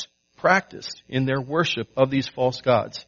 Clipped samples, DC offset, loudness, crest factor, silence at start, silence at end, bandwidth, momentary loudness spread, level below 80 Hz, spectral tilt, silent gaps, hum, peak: under 0.1%; under 0.1%; -23 LUFS; 22 dB; 0 s; 0.05 s; 7.2 kHz; 11 LU; -60 dBFS; -4 dB/octave; none; none; -2 dBFS